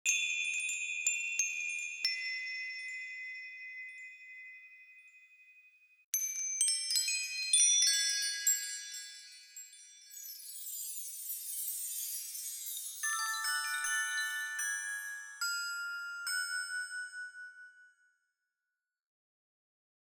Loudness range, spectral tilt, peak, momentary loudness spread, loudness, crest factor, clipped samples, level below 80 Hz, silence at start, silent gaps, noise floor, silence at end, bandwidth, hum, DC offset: 13 LU; 8 dB/octave; -14 dBFS; 19 LU; -33 LUFS; 22 dB; under 0.1%; under -90 dBFS; 0.05 s; 6.04-6.13 s; -90 dBFS; 2.15 s; over 20 kHz; none; under 0.1%